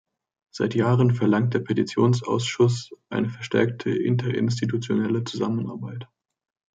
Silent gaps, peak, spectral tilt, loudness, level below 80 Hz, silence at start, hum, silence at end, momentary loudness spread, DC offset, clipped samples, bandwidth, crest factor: none; -6 dBFS; -7 dB/octave; -24 LUFS; -66 dBFS; 0.55 s; none; 0.7 s; 11 LU; under 0.1%; under 0.1%; 9 kHz; 18 dB